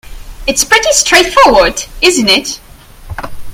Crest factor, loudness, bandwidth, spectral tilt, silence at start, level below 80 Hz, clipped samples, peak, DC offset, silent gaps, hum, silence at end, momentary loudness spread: 10 dB; -8 LUFS; over 20 kHz; -1.5 dB/octave; 0.05 s; -30 dBFS; 1%; 0 dBFS; under 0.1%; none; none; 0 s; 19 LU